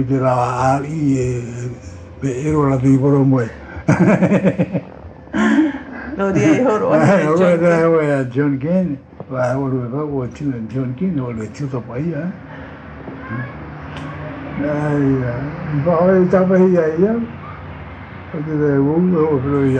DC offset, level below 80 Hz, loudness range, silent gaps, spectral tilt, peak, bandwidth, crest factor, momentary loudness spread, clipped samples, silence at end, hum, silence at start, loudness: under 0.1%; -44 dBFS; 9 LU; none; -8 dB/octave; -2 dBFS; 9 kHz; 16 dB; 17 LU; under 0.1%; 0 s; none; 0 s; -17 LUFS